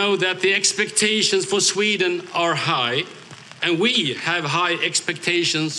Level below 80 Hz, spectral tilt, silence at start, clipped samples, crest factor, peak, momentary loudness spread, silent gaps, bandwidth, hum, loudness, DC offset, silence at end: -70 dBFS; -2 dB/octave; 0 s; under 0.1%; 16 dB; -6 dBFS; 5 LU; none; 12.5 kHz; none; -19 LUFS; under 0.1%; 0 s